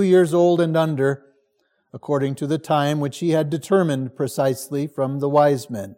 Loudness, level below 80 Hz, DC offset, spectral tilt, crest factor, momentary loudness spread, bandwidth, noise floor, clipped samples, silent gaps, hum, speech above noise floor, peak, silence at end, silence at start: -20 LUFS; -68 dBFS; under 0.1%; -6.5 dB/octave; 16 dB; 9 LU; 16.5 kHz; -68 dBFS; under 0.1%; none; none; 49 dB; -4 dBFS; 0.05 s; 0 s